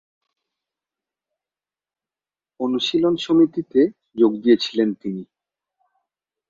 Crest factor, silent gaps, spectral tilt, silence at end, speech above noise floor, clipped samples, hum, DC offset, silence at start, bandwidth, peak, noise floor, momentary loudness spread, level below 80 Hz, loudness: 20 dB; none; -6 dB/octave; 1.25 s; over 71 dB; under 0.1%; none; under 0.1%; 2.6 s; 7.6 kHz; -4 dBFS; under -90 dBFS; 11 LU; -66 dBFS; -20 LUFS